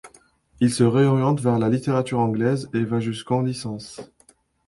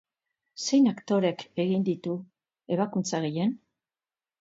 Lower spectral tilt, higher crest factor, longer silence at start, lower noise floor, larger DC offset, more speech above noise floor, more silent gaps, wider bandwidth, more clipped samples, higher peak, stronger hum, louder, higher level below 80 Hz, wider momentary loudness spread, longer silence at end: first, -7 dB/octave vs -5.5 dB/octave; about the same, 18 dB vs 16 dB; second, 0.05 s vs 0.55 s; second, -58 dBFS vs under -90 dBFS; neither; second, 37 dB vs over 64 dB; neither; first, 11.5 kHz vs 8 kHz; neither; first, -6 dBFS vs -12 dBFS; neither; first, -22 LUFS vs -28 LUFS; first, -56 dBFS vs -76 dBFS; about the same, 13 LU vs 11 LU; second, 0.6 s vs 0.85 s